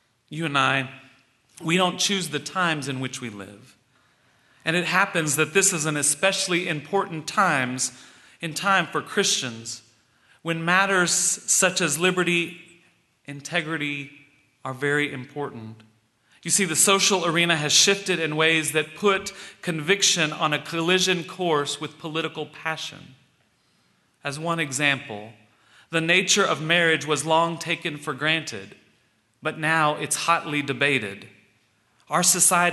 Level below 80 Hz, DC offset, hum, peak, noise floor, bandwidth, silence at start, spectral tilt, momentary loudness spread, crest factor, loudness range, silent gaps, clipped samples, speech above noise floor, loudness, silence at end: -70 dBFS; under 0.1%; none; -4 dBFS; -65 dBFS; 12.5 kHz; 0.3 s; -2.5 dB/octave; 16 LU; 20 dB; 8 LU; none; under 0.1%; 42 dB; -22 LUFS; 0 s